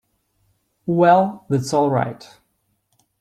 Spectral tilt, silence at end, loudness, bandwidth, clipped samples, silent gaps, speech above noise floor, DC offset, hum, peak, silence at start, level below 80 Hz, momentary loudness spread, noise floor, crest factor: -7 dB/octave; 1.05 s; -18 LUFS; 14 kHz; under 0.1%; none; 51 dB; under 0.1%; none; -2 dBFS; 0.85 s; -62 dBFS; 16 LU; -69 dBFS; 18 dB